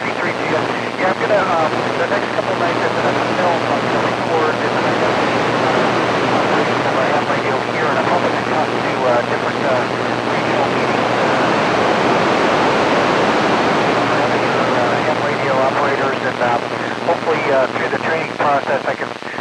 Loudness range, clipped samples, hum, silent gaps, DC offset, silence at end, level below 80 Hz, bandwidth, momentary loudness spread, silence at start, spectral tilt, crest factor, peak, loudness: 2 LU; under 0.1%; none; none; under 0.1%; 0 s; -52 dBFS; 13 kHz; 4 LU; 0 s; -5 dB/octave; 14 dB; -2 dBFS; -16 LUFS